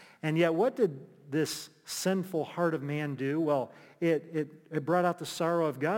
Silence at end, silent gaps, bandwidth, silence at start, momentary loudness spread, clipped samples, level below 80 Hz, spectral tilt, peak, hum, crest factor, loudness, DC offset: 0 s; none; 17 kHz; 0 s; 9 LU; under 0.1%; -82 dBFS; -5.5 dB/octave; -14 dBFS; none; 18 dB; -31 LUFS; under 0.1%